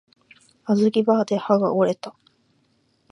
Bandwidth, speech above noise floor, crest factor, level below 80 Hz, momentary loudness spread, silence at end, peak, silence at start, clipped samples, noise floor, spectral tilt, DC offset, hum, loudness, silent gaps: 10.5 kHz; 45 dB; 20 dB; -70 dBFS; 15 LU; 1 s; -4 dBFS; 0.65 s; under 0.1%; -65 dBFS; -7 dB/octave; under 0.1%; none; -21 LUFS; none